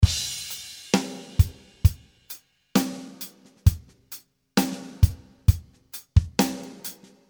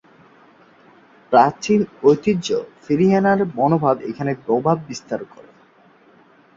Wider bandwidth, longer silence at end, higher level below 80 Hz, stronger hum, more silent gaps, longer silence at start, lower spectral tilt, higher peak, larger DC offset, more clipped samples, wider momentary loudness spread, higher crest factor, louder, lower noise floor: first, over 20 kHz vs 7.6 kHz; second, 0.35 s vs 1.35 s; first, -30 dBFS vs -58 dBFS; neither; neither; second, 0 s vs 1.3 s; second, -5 dB/octave vs -6.5 dB/octave; about the same, -2 dBFS vs -2 dBFS; neither; neither; first, 17 LU vs 12 LU; about the same, 22 dB vs 18 dB; second, -26 LUFS vs -19 LUFS; second, -46 dBFS vs -52 dBFS